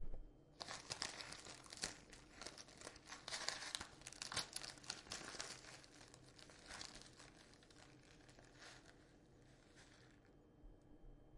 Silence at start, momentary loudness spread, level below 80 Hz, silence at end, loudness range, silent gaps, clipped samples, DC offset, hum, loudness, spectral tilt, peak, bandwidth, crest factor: 0 s; 21 LU; -64 dBFS; 0 s; 16 LU; none; under 0.1%; under 0.1%; none; -51 LUFS; -1 dB/octave; -22 dBFS; 11.5 kHz; 32 dB